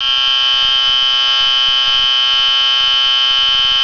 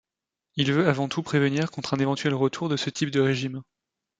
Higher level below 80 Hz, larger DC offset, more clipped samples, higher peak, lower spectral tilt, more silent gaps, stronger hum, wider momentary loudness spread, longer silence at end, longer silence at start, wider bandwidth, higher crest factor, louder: first, -42 dBFS vs -64 dBFS; neither; neither; about the same, -4 dBFS vs -4 dBFS; second, 2 dB/octave vs -5.5 dB/octave; neither; neither; second, 0 LU vs 6 LU; second, 0 s vs 0.6 s; second, 0 s vs 0.55 s; second, 5.4 kHz vs 9.2 kHz; second, 10 dB vs 22 dB; first, -9 LUFS vs -25 LUFS